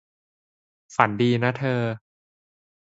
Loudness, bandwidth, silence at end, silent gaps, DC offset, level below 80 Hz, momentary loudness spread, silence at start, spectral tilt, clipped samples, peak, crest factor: -23 LUFS; 8 kHz; 0.9 s; none; under 0.1%; -64 dBFS; 10 LU; 0.9 s; -7 dB/octave; under 0.1%; 0 dBFS; 26 dB